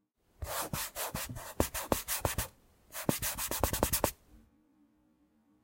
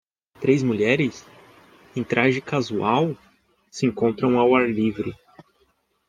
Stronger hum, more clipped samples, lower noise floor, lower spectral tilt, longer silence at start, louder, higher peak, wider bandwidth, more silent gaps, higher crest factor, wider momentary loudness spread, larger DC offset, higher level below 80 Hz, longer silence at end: neither; neither; first, -70 dBFS vs -66 dBFS; second, -3.5 dB/octave vs -6.5 dB/octave; about the same, 0.4 s vs 0.4 s; second, -34 LUFS vs -22 LUFS; second, -10 dBFS vs -4 dBFS; first, 17 kHz vs 9.4 kHz; neither; first, 28 dB vs 20 dB; second, 9 LU vs 13 LU; neither; first, -48 dBFS vs -60 dBFS; first, 1.25 s vs 0.95 s